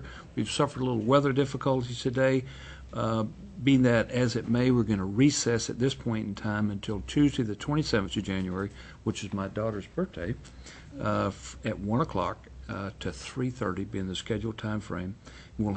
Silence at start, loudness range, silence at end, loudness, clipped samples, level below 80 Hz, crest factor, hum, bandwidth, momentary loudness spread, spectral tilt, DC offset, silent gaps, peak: 0 s; 7 LU; 0 s; -29 LUFS; under 0.1%; -50 dBFS; 20 dB; none; 8.6 kHz; 13 LU; -6 dB/octave; under 0.1%; none; -10 dBFS